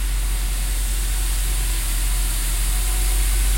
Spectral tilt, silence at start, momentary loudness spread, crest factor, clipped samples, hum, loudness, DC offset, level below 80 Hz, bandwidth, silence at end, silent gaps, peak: -2.5 dB/octave; 0 s; 3 LU; 10 dB; under 0.1%; none; -23 LUFS; under 0.1%; -20 dBFS; 16.5 kHz; 0 s; none; -10 dBFS